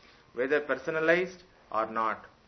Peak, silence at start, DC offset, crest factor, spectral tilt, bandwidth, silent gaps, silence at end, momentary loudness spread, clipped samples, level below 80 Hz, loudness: -10 dBFS; 0.35 s; under 0.1%; 20 dB; -5.5 dB/octave; 6.4 kHz; none; 0.2 s; 10 LU; under 0.1%; -68 dBFS; -30 LUFS